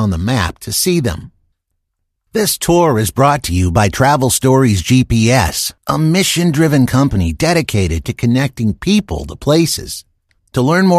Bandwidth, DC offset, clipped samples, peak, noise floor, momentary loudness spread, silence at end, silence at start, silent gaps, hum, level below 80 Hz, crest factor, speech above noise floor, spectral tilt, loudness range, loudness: 14.5 kHz; under 0.1%; under 0.1%; 0 dBFS; -71 dBFS; 7 LU; 0 s; 0 s; none; none; -32 dBFS; 14 dB; 58 dB; -5 dB/octave; 4 LU; -14 LUFS